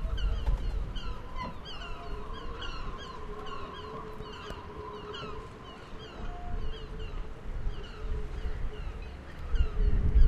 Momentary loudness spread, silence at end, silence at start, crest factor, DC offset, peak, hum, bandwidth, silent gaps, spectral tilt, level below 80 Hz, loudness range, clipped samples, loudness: 10 LU; 0 s; 0 s; 22 dB; under 0.1%; -10 dBFS; none; 7.4 kHz; none; -6.5 dB/octave; -32 dBFS; 4 LU; under 0.1%; -39 LUFS